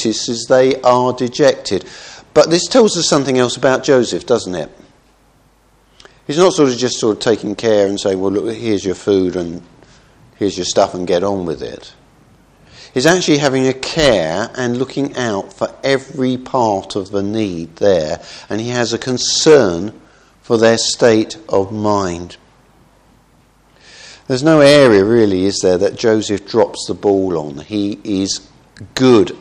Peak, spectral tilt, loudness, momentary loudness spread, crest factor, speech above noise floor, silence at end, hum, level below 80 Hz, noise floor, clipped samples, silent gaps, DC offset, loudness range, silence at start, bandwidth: 0 dBFS; -4.5 dB/octave; -14 LUFS; 12 LU; 16 dB; 38 dB; 0.05 s; none; -48 dBFS; -52 dBFS; under 0.1%; none; under 0.1%; 6 LU; 0 s; 12.5 kHz